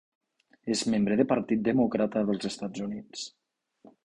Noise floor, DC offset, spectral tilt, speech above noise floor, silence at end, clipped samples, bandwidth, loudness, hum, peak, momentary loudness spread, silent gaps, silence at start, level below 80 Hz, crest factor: -59 dBFS; under 0.1%; -5.5 dB/octave; 31 dB; 0.75 s; under 0.1%; 11.5 kHz; -28 LUFS; none; -10 dBFS; 14 LU; none; 0.65 s; -62 dBFS; 20 dB